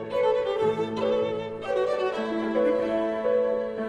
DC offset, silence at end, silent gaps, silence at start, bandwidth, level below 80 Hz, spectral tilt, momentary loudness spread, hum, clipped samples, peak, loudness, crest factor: under 0.1%; 0 s; none; 0 s; 9.4 kHz; -60 dBFS; -6.5 dB/octave; 4 LU; none; under 0.1%; -14 dBFS; -26 LUFS; 12 dB